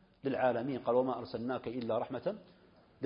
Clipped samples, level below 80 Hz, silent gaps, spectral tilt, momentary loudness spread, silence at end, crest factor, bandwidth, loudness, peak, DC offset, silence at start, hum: under 0.1%; -72 dBFS; none; -5.5 dB/octave; 7 LU; 0 s; 18 dB; 5.2 kHz; -35 LUFS; -18 dBFS; under 0.1%; 0.25 s; none